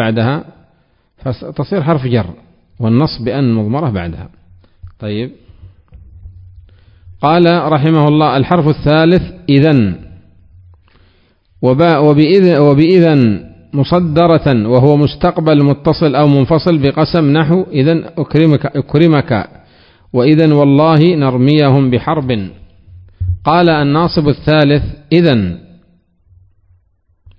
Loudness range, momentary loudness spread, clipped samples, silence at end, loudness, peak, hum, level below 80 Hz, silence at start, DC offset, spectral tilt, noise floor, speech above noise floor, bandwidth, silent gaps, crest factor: 7 LU; 13 LU; 0.5%; 1.8 s; -11 LUFS; 0 dBFS; none; -36 dBFS; 0 s; under 0.1%; -10 dB/octave; -56 dBFS; 46 dB; 5.4 kHz; none; 12 dB